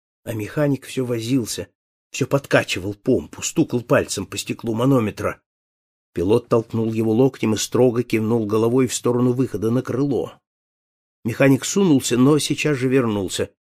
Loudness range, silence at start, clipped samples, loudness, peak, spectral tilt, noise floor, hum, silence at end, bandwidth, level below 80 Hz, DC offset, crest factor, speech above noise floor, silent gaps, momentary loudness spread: 3 LU; 0.25 s; under 0.1%; -20 LUFS; -2 dBFS; -5.5 dB/octave; under -90 dBFS; none; 0.2 s; 15.5 kHz; -54 dBFS; under 0.1%; 18 dB; over 70 dB; 1.75-2.11 s, 5.46-6.13 s, 10.47-11.23 s; 10 LU